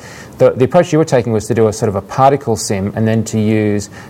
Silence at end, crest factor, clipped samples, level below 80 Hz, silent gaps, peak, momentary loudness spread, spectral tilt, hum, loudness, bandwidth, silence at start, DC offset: 0 s; 14 dB; 0.2%; -46 dBFS; none; 0 dBFS; 6 LU; -6 dB/octave; none; -14 LUFS; 16 kHz; 0 s; under 0.1%